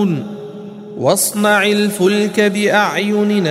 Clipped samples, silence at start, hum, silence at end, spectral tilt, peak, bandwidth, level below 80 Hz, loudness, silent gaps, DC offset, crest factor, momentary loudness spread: under 0.1%; 0 s; none; 0 s; -4 dB/octave; 0 dBFS; 16 kHz; -64 dBFS; -14 LUFS; none; under 0.1%; 14 dB; 17 LU